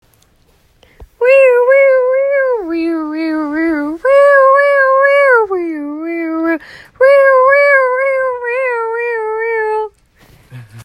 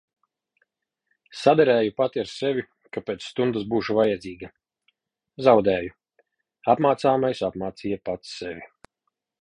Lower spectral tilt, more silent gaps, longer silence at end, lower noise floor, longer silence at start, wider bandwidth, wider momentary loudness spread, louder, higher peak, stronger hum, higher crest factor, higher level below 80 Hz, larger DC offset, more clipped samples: about the same, -5.5 dB/octave vs -6 dB/octave; neither; second, 0 s vs 0.8 s; second, -52 dBFS vs -80 dBFS; second, 1 s vs 1.35 s; second, 9 kHz vs 10.5 kHz; second, 10 LU vs 17 LU; first, -11 LUFS vs -23 LUFS; first, 0 dBFS vs -4 dBFS; neither; second, 12 dB vs 22 dB; first, -52 dBFS vs -60 dBFS; neither; neither